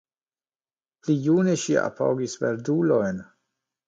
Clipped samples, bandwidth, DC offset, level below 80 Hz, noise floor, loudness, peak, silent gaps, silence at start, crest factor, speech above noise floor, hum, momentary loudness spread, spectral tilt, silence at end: under 0.1%; 9.2 kHz; under 0.1%; -66 dBFS; under -90 dBFS; -24 LUFS; -8 dBFS; none; 1.05 s; 16 dB; over 67 dB; none; 8 LU; -6 dB/octave; 0.65 s